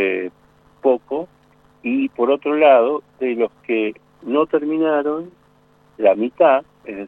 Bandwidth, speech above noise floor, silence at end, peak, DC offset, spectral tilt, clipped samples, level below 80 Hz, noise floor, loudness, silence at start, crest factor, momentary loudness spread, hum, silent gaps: 4.1 kHz; 38 dB; 0 s; -2 dBFS; under 0.1%; -8 dB/octave; under 0.1%; -64 dBFS; -55 dBFS; -18 LUFS; 0 s; 18 dB; 14 LU; none; none